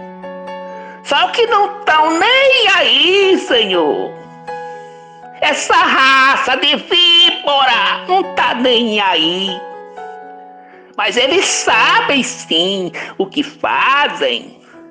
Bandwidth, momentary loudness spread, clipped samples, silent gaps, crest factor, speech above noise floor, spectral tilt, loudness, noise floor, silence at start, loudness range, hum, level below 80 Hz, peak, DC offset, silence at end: 10 kHz; 20 LU; under 0.1%; none; 12 dB; 26 dB; -1.5 dB/octave; -12 LUFS; -39 dBFS; 0 s; 5 LU; none; -58 dBFS; -2 dBFS; under 0.1%; 0.05 s